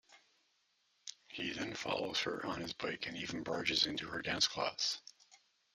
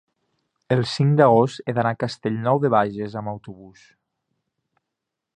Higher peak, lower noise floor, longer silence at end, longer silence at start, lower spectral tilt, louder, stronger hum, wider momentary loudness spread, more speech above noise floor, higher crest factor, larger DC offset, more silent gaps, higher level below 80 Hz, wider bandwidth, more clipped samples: second, -18 dBFS vs -2 dBFS; second, -77 dBFS vs -83 dBFS; second, 0.4 s vs 1.65 s; second, 0.1 s vs 0.7 s; second, -2.5 dB/octave vs -7.5 dB/octave; second, -37 LUFS vs -21 LUFS; neither; about the same, 14 LU vs 14 LU; second, 39 dB vs 62 dB; about the same, 24 dB vs 22 dB; neither; neither; second, -70 dBFS vs -62 dBFS; first, 14 kHz vs 9.6 kHz; neither